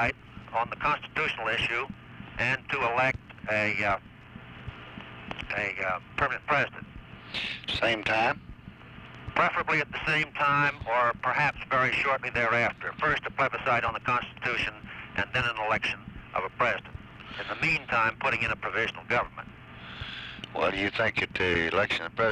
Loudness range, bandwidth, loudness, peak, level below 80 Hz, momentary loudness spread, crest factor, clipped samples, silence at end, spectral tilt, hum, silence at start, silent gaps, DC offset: 4 LU; 12 kHz; -28 LUFS; -12 dBFS; -52 dBFS; 18 LU; 16 dB; under 0.1%; 0 s; -5 dB/octave; none; 0 s; none; under 0.1%